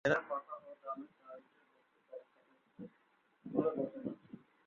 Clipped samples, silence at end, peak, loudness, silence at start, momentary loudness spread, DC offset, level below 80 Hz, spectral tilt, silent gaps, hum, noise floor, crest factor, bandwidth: under 0.1%; 0.3 s; -18 dBFS; -40 LUFS; 0.05 s; 20 LU; under 0.1%; -78 dBFS; -5 dB/octave; none; none; -74 dBFS; 24 dB; 4.3 kHz